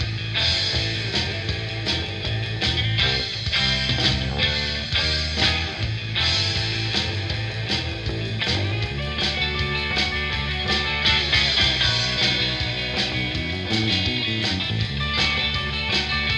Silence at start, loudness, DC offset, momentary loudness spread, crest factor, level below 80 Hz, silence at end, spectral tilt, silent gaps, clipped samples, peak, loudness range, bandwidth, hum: 0 s; -21 LUFS; under 0.1%; 7 LU; 18 dB; -34 dBFS; 0 s; -4 dB/octave; none; under 0.1%; -4 dBFS; 4 LU; 11 kHz; none